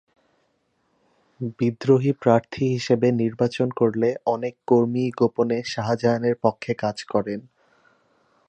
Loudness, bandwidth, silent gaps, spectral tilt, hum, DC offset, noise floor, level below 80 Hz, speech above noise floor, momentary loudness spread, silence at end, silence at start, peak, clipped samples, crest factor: -22 LUFS; 8.8 kHz; none; -7 dB/octave; none; under 0.1%; -69 dBFS; -62 dBFS; 47 dB; 7 LU; 1.1 s; 1.4 s; -4 dBFS; under 0.1%; 20 dB